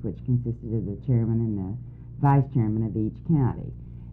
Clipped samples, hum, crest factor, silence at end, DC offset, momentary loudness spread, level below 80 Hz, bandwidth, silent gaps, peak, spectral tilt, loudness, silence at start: under 0.1%; none; 16 dB; 0 s; under 0.1%; 15 LU; -44 dBFS; 2.9 kHz; none; -8 dBFS; -13 dB/octave; -26 LUFS; 0 s